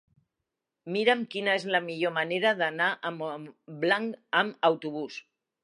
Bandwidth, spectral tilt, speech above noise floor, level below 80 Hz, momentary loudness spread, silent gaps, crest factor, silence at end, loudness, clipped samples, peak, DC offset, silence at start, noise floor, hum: 11.5 kHz; -5 dB/octave; 57 dB; -86 dBFS; 13 LU; none; 22 dB; 0.45 s; -28 LUFS; under 0.1%; -8 dBFS; under 0.1%; 0.85 s; -86 dBFS; none